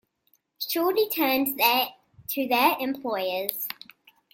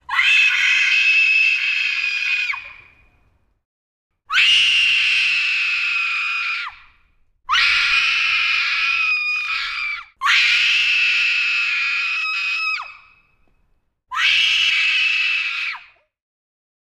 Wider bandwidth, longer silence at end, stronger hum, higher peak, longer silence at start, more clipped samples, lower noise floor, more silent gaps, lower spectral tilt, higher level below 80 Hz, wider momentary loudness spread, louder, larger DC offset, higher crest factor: about the same, 17 kHz vs 15.5 kHz; second, 0.6 s vs 1.05 s; neither; about the same, -4 dBFS vs -4 dBFS; first, 0.6 s vs 0.1 s; neither; first, -69 dBFS vs -63 dBFS; second, none vs 3.65-4.10 s; first, -2 dB/octave vs 3.5 dB/octave; second, -70 dBFS vs -58 dBFS; about the same, 12 LU vs 10 LU; second, -25 LUFS vs -15 LUFS; neither; first, 24 dB vs 16 dB